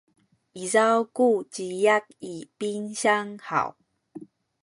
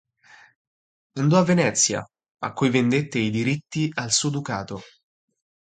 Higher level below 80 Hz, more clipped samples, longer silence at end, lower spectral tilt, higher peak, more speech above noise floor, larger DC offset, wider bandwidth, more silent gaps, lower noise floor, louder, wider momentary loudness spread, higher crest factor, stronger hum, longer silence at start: second, -74 dBFS vs -60 dBFS; neither; second, 0.4 s vs 0.75 s; about the same, -3.5 dB/octave vs -4.5 dB/octave; about the same, -6 dBFS vs -4 dBFS; second, 21 dB vs 31 dB; neither; first, 11.5 kHz vs 9.4 kHz; second, none vs 2.31-2.35 s; second, -46 dBFS vs -53 dBFS; second, -25 LUFS vs -22 LUFS; first, 17 LU vs 14 LU; about the same, 20 dB vs 20 dB; neither; second, 0.55 s vs 1.15 s